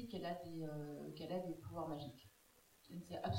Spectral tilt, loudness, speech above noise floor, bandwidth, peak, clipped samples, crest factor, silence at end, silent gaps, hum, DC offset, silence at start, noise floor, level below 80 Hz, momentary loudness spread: -7 dB/octave; -48 LUFS; 25 dB; 16 kHz; -30 dBFS; under 0.1%; 16 dB; 0 s; none; none; under 0.1%; 0 s; -71 dBFS; -72 dBFS; 20 LU